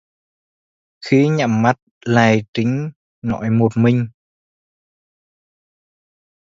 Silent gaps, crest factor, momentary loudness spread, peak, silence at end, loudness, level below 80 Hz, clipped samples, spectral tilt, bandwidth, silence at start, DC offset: 1.82-2.01 s, 2.48-2.53 s, 2.96-3.22 s; 20 dB; 13 LU; 0 dBFS; 2.45 s; -17 LUFS; -54 dBFS; under 0.1%; -7 dB/octave; 7.6 kHz; 1 s; under 0.1%